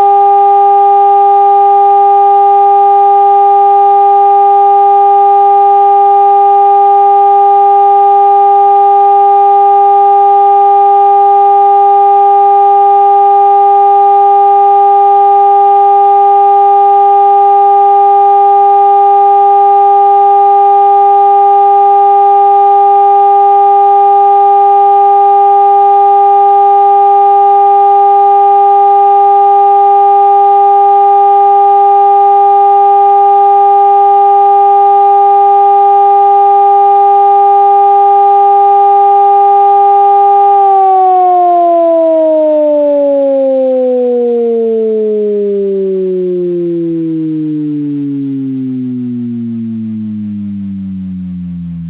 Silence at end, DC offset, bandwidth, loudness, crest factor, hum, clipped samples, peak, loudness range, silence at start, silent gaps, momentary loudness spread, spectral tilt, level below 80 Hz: 0 s; under 0.1%; 4 kHz; -6 LUFS; 6 dB; none; under 0.1%; 0 dBFS; 6 LU; 0 s; none; 7 LU; -10 dB/octave; -52 dBFS